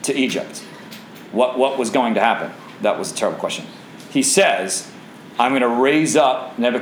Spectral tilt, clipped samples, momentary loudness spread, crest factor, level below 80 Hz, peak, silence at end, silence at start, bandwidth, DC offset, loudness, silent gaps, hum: -3 dB/octave; under 0.1%; 21 LU; 18 dB; -72 dBFS; -2 dBFS; 0 s; 0 s; over 20 kHz; under 0.1%; -18 LUFS; none; none